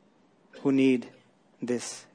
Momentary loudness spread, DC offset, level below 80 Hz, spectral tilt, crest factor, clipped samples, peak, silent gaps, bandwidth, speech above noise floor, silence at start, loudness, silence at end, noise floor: 15 LU; under 0.1%; -82 dBFS; -5 dB/octave; 16 dB; under 0.1%; -14 dBFS; none; 10.5 kHz; 36 dB; 0.55 s; -27 LUFS; 0.15 s; -63 dBFS